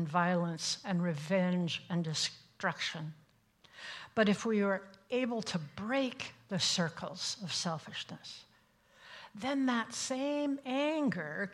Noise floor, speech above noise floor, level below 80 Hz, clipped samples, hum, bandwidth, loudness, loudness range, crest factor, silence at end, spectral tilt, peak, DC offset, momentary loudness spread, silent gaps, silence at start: -67 dBFS; 33 dB; -76 dBFS; under 0.1%; none; 12.5 kHz; -34 LUFS; 3 LU; 20 dB; 0 s; -4.5 dB/octave; -16 dBFS; under 0.1%; 14 LU; none; 0 s